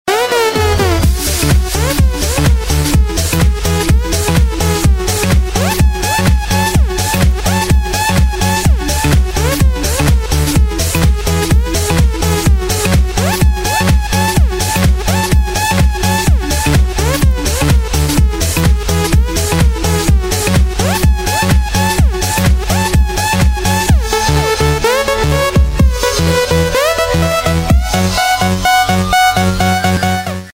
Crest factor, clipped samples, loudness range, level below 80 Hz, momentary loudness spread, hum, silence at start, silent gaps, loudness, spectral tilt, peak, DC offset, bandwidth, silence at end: 12 dB; under 0.1%; 1 LU; -16 dBFS; 2 LU; none; 0.05 s; none; -12 LUFS; -4.5 dB/octave; 0 dBFS; under 0.1%; 16.5 kHz; 0.05 s